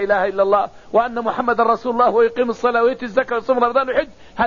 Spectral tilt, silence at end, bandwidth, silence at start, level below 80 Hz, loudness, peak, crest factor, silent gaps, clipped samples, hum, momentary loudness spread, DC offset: -3 dB/octave; 0 s; 7.2 kHz; 0 s; -50 dBFS; -18 LUFS; -4 dBFS; 14 dB; none; under 0.1%; none; 5 LU; 0.6%